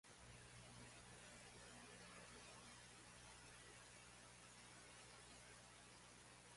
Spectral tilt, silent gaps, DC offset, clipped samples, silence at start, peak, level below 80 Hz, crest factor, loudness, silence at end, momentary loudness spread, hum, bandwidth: -2.5 dB/octave; none; under 0.1%; under 0.1%; 0.05 s; -48 dBFS; -76 dBFS; 14 dB; -61 LUFS; 0 s; 3 LU; 60 Hz at -70 dBFS; 11.5 kHz